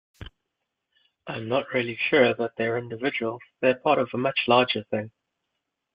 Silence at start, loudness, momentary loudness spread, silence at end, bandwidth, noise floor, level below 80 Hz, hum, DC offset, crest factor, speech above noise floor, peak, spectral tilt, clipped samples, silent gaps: 0.2 s; -24 LUFS; 12 LU; 0.85 s; 5.2 kHz; -82 dBFS; -60 dBFS; none; under 0.1%; 20 dB; 57 dB; -6 dBFS; -8 dB/octave; under 0.1%; none